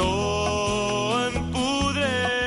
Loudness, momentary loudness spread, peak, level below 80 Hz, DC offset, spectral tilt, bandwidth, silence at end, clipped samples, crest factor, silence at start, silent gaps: -24 LUFS; 2 LU; -12 dBFS; -38 dBFS; under 0.1%; -4 dB/octave; 11.5 kHz; 0 s; under 0.1%; 12 dB; 0 s; none